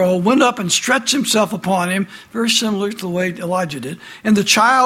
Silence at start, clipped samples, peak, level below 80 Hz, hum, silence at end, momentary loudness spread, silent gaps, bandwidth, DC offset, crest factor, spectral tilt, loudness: 0 s; under 0.1%; 0 dBFS; -58 dBFS; none; 0 s; 10 LU; none; 16.5 kHz; under 0.1%; 16 dB; -3.5 dB/octave; -16 LUFS